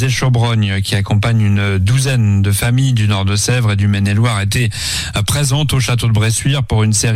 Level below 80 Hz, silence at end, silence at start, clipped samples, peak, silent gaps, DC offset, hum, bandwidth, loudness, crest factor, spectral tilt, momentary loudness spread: -34 dBFS; 0 s; 0 s; under 0.1%; -4 dBFS; none; under 0.1%; none; 15.5 kHz; -14 LUFS; 8 dB; -4.5 dB/octave; 3 LU